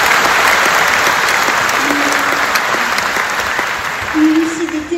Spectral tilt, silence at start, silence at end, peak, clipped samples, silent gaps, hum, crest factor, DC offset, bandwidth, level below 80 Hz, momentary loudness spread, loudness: -2 dB/octave; 0 s; 0 s; 0 dBFS; under 0.1%; none; none; 12 dB; under 0.1%; 16.5 kHz; -44 dBFS; 7 LU; -12 LUFS